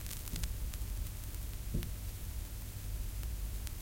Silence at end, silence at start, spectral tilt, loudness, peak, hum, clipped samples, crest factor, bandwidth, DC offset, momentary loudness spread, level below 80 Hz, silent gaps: 0 s; 0 s; -4 dB/octave; -43 LUFS; -18 dBFS; none; under 0.1%; 22 dB; 17 kHz; under 0.1%; 3 LU; -42 dBFS; none